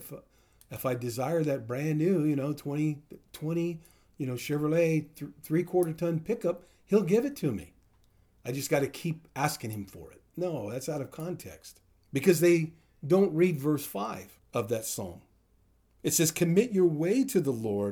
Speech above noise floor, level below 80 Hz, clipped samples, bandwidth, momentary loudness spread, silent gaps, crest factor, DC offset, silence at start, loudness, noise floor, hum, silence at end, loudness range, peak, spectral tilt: 37 dB; -66 dBFS; under 0.1%; over 20 kHz; 17 LU; none; 20 dB; under 0.1%; 0 s; -29 LUFS; -66 dBFS; none; 0 s; 6 LU; -10 dBFS; -5.5 dB/octave